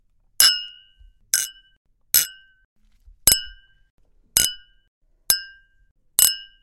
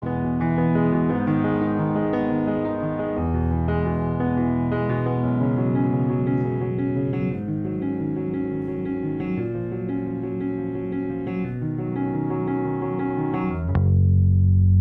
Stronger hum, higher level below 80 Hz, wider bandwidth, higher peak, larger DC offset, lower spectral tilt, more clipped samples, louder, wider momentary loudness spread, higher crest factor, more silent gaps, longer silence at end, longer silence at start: neither; second, -48 dBFS vs -42 dBFS; first, 17 kHz vs 3.8 kHz; first, 0 dBFS vs -8 dBFS; neither; second, 2 dB/octave vs -12 dB/octave; neither; first, -19 LUFS vs -23 LUFS; first, 14 LU vs 8 LU; first, 24 dB vs 16 dB; first, 1.77-1.85 s, 2.65-2.76 s, 3.90-3.98 s, 4.88-5.01 s, 5.91-5.95 s vs none; first, 0.2 s vs 0 s; first, 0.4 s vs 0 s